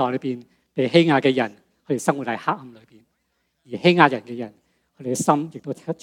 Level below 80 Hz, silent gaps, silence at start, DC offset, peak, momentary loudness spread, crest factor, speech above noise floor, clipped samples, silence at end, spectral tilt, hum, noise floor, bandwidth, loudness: -72 dBFS; none; 0 s; under 0.1%; 0 dBFS; 17 LU; 22 dB; 51 dB; under 0.1%; 0.1 s; -5 dB/octave; none; -72 dBFS; 16 kHz; -21 LUFS